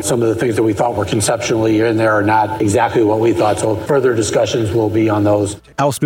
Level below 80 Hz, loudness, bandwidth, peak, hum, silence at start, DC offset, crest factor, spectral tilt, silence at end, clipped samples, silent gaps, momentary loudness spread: -46 dBFS; -15 LUFS; 16.5 kHz; -2 dBFS; none; 0 s; under 0.1%; 12 dB; -5.5 dB/octave; 0 s; under 0.1%; none; 3 LU